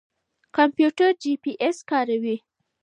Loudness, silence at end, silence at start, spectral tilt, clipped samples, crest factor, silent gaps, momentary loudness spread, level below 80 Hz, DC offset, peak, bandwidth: -23 LUFS; 0.45 s; 0.55 s; -4.5 dB/octave; under 0.1%; 18 dB; none; 10 LU; -78 dBFS; under 0.1%; -4 dBFS; 9.8 kHz